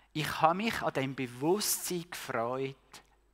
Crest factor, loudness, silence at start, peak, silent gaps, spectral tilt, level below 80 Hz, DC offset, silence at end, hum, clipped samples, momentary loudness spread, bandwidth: 24 dB; -32 LUFS; 0.15 s; -10 dBFS; none; -3.5 dB/octave; -64 dBFS; under 0.1%; 0.35 s; none; under 0.1%; 9 LU; 16 kHz